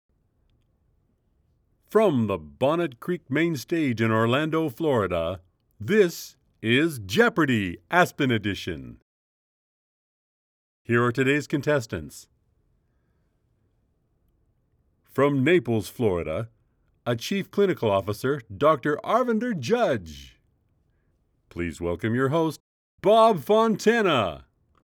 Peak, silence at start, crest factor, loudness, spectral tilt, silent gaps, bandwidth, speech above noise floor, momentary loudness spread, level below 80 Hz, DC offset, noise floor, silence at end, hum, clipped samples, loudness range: -4 dBFS; 1.9 s; 22 dB; -24 LUFS; -6 dB/octave; 9.02-10.85 s, 22.60-22.98 s; over 20 kHz; 46 dB; 12 LU; -60 dBFS; under 0.1%; -69 dBFS; 0.45 s; none; under 0.1%; 5 LU